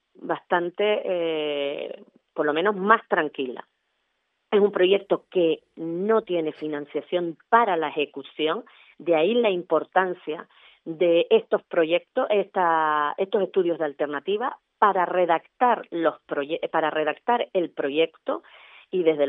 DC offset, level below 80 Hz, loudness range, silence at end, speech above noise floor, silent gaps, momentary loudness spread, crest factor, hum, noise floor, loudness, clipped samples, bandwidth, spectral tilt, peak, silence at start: under 0.1%; -82 dBFS; 2 LU; 0 s; 51 dB; none; 11 LU; 24 dB; none; -75 dBFS; -24 LUFS; under 0.1%; 4 kHz; -8.5 dB/octave; -2 dBFS; 0.2 s